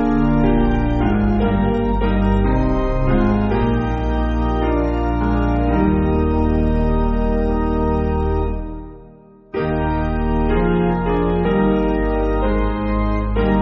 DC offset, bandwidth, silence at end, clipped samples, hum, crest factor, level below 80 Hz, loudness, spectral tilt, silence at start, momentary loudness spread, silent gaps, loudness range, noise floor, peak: under 0.1%; 6 kHz; 0 s; under 0.1%; none; 14 dB; -22 dBFS; -18 LUFS; -7.5 dB/octave; 0 s; 4 LU; none; 3 LU; -44 dBFS; -4 dBFS